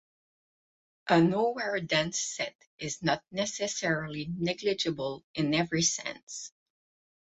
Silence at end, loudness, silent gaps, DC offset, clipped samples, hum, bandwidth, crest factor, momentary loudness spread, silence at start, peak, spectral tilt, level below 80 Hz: 0.75 s; -30 LUFS; 2.55-2.59 s, 2.67-2.78 s, 5.24-5.34 s, 6.23-6.27 s; under 0.1%; under 0.1%; none; 8.4 kHz; 22 dB; 13 LU; 1.05 s; -10 dBFS; -3.5 dB/octave; -64 dBFS